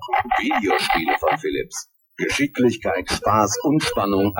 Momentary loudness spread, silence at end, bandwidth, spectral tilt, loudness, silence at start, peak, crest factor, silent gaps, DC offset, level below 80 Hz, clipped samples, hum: 9 LU; 0 s; 18 kHz; -4 dB/octave; -20 LUFS; 0 s; -2 dBFS; 18 dB; none; under 0.1%; -46 dBFS; under 0.1%; none